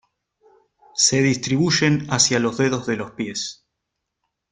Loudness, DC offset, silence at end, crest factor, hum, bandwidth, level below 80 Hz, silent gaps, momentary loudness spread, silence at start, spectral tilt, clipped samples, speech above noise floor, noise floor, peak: -19 LUFS; under 0.1%; 1 s; 20 dB; none; 11 kHz; -56 dBFS; none; 11 LU; 0.95 s; -3.5 dB/octave; under 0.1%; 60 dB; -80 dBFS; -2 dBFS